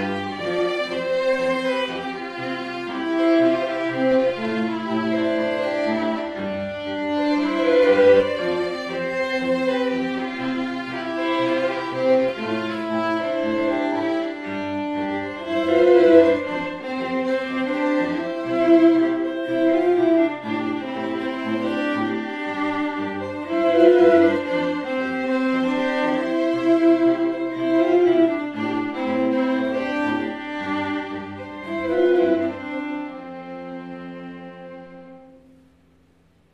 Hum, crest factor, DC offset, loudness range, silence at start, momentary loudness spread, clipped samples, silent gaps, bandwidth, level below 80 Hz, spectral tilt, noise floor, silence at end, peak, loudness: none; 18 dB; under 0.1%; 5 LU; 0 s; 12 LU; under 0.1%; none; 9 kHz; -62 dBFS; -6 dB/octave; -58 dBFS; 1.3 s; -2 dBFS; -21 LUFS